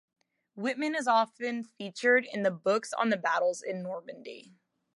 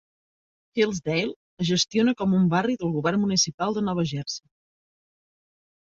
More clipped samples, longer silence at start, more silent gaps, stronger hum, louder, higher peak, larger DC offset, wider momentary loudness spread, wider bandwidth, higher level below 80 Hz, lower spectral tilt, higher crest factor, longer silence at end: neither; second, 0.55 s vs 0.75 s; second, none vs 1.36-1.57 s, 3.54-3.58 s; neither; second, -29 LUFS vs -24 LUFS; second, -12 dBFS vs -8 dBFS; neither; first, 15 LU vs 10 LU; first, 11.5 kHz vs 7.8 kHz; second, -86 dBFS vs -60 dBFS; about the same, -4 dB/octave vs -4.5 dB/octave; about the same, 18 dB vs 18 dB; second, 0.55 s vs 1.5 s